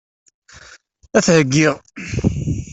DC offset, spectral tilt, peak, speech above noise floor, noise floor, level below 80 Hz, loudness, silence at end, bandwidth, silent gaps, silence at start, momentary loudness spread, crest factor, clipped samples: under 0.1%; -5 dB/octave; -2 dBFS; 30 dB; -46 dBFS; -38 dBFS; -17 LUFS; 0 s; 8.4 kHz; none; 1.15 s; 12 LU; 16 dB; under 0.1%